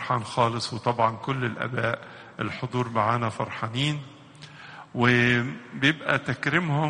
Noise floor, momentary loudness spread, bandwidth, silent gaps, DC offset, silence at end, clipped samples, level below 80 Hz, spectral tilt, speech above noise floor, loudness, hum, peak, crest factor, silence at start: -46 dBFS; 18 LU; 10 kHz; none; under 0.1%; 0 s; under 0.1%; -60 dBFS; -5.5 dB/octave; 21 dB; -26 LUFS; none; -6 dBFS; 20 dB; 0 s